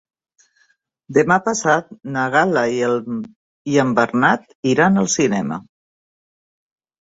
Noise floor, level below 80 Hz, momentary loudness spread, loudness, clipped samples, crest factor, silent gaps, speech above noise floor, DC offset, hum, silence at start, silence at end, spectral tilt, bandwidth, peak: -62 dBFS; -60 dBFS; 12 LU; -18 LUFS; under 0.1%; 20 dB; 3.36-3.65 s, 4.55-4.63 s; 45 dB; under 0.1%; none; 1.1 s; 1.35 s; -5 dB/octave; 8 kHz; 0 dBFS